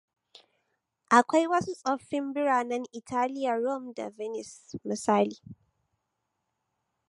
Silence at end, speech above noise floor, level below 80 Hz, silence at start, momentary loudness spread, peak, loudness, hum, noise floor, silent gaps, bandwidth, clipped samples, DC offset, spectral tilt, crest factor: 1.55 s; 53 dB; -72 dBFS; 1.1 s; 15 LU; -4 dBFS; -28 LUFS; none; -81 dBFS; none; 11.5 kHz; under 0.1%; under 0.1%; -4.5 dB/octave; 26 dB